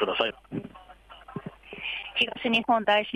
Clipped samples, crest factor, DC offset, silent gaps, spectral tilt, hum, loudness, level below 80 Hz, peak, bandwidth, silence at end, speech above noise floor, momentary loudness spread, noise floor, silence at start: under 0.1%; 18 dB; under 0.1%; none; -5 dB/octave; none; -27 LUFS; -60 dBFS; -10 dBFS; 12.5 kHz; 0 s; 25 dB; 19 LU; -50 dBFS; 0 s